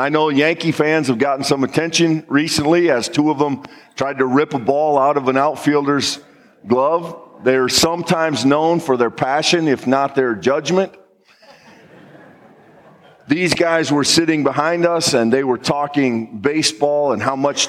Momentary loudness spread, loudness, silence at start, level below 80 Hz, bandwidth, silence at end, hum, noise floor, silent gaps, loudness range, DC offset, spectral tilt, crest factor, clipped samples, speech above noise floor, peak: 5 LU; -16 LUFS; 0 s; -58 dBFS; 15.5 kHz; 0 s; none; -49 dBFS; none; 5 LU; under 0.1%; -4 dB/octave; 16 dB; under 0.1%; 33 dB; -2 dBFS